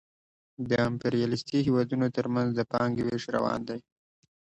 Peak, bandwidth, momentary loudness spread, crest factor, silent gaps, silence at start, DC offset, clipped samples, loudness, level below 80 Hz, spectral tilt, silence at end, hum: -12 dBFS; 8.4 kHz; 6 LU; 16 dB; none; 0.6 s; under 0.1%; under 0.1%; -28 LUFS; -60 dBFS; -7 dB/octave; 0.6 s; none